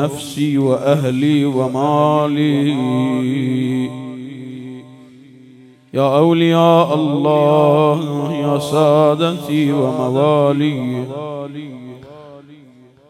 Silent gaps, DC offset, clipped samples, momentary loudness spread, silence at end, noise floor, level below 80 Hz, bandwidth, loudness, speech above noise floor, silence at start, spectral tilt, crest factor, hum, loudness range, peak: none; under 0.1%; under 0.1%; 17 LU; 0.55 s; -45 dBFS; -64 dBFS; 14.5 kHz; -15 LUFS; 30 dB; 0 s; -7 dB/octave; 16 dB; none; 6 LU; 0 dBFS